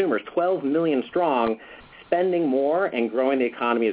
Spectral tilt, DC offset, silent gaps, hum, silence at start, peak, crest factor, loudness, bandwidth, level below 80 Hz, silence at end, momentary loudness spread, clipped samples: -10 dB/octave; under 0.1%; none; none; 0 s; -8 dBFS; 16 dB; -23 LUFS; 4 kHz; -64 dBFS; 0 s; 4 LU; under 0.1%